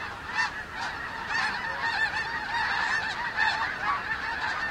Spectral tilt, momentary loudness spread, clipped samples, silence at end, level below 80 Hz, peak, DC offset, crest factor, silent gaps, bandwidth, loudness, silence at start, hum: -2 dB/octave; 7 LU; under 0.1%; 0 s; -54 dBFS; -12 dBFS; under 0.1%; 16 dB; none; 16.5 kHz; -28 LUFS; 0 s; none